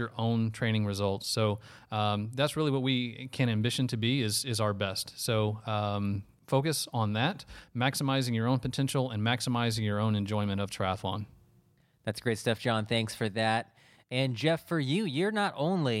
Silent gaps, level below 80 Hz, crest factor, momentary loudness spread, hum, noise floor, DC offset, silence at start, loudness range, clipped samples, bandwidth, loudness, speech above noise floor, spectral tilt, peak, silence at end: none; -62 dBFS; 18 dB; 6 LU; none; -66 dBFS; under 0.1%; 0 s; 2 LU; under 0.1%; 15 kHz; -30 LUFS; 36 dB; -5 dB/octave; -12 dBFS; 0 s